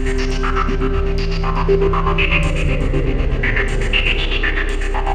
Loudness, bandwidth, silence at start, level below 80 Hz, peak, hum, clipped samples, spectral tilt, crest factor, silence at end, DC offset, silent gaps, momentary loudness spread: -18 LUFS; 9.2 kHz; 0 s; -18 dBFS; -2 dBFS; none; under 0.1%; -5.5 dB/octave; 14 dB; 0 s; under 0.1%; none; 5 LU